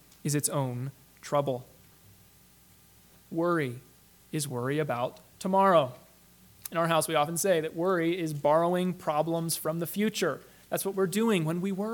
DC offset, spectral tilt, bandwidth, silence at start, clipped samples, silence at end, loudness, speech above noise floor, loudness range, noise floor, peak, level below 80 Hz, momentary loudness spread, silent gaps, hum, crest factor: under 0.1%; -5 dB/octave; 19 kHz; 0.25 s; under 0.1%; 0 s; -29 LUFS; 30 dB; 7 LU; -58 dBFS; -10 dBFS; -70 dBFS; 12 LU; none; none; 20 dB